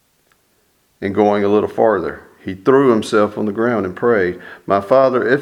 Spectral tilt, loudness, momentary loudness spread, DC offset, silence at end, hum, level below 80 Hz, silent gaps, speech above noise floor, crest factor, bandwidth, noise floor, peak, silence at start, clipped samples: -7 dB/octave; -16 LUFS; 12 LU; under 0.1%; 0 s; none; -56 dBFS; none; 45 dB; 16 dB; 12 kHz; -60 dBFS; 0 dBFS; 1 s; under 0.1%